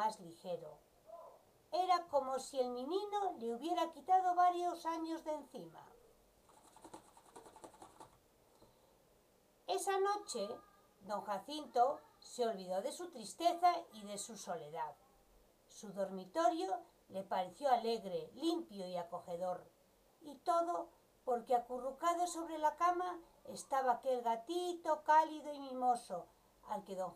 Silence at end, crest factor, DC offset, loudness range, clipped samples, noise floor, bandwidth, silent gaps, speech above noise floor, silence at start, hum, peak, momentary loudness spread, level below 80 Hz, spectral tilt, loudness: 0 s; 20 dB; under 0.1%; 6 LU; under 0.1%; -71 dBFS; 15.5 kHz; none; 33 dB; 0 s; none; -20 dBFS; 20 LU; -80 dBFS; -3.5 dB/octave; -39 LUFS